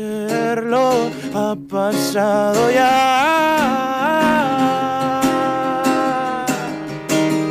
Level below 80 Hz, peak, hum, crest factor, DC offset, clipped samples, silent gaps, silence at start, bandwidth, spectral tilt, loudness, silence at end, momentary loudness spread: -54 dBFS; -4 dBFS; none; 12 dB; under 0.1%; under 0.1%; none; 0 s; 15.5 kHz; -4.5 dB/octave; -17 LUFS; 0 s; 8 LU